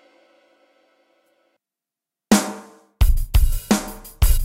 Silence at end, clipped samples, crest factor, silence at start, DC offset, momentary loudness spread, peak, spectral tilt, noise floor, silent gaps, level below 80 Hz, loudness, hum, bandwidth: 0 s; under 0.1%; 16 dB; 2.3 s; under 0.1%; 13 LU; -4 dBFS; -5 dB/octave; -88 dBFS; none; -22 dBFS; -21 LUFS; none; 16.5 kHz